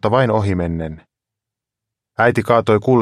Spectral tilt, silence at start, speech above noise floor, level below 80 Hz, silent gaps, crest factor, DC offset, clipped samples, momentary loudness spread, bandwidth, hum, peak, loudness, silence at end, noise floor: -7.5 dB/octave; 0.05 s; 69 dB; -44 dBFS; none; 16 dB; under 0.1%; under 0.1%; 13 LU; 13 kHz; none; 0 dBFS; -17 LUFS; 0 s; -84 dBFS